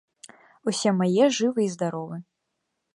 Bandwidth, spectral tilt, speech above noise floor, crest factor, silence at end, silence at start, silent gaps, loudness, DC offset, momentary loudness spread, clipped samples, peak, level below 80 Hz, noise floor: 11.5 kHz; -5 dB/octave; 56 dB; 18 dB; 0.7 s; 0.65 s; none; -24 LUFS; under 0.1%; 15 LU; under 0.1%; -8 dBFS; -76 dBFS; -79 dBFS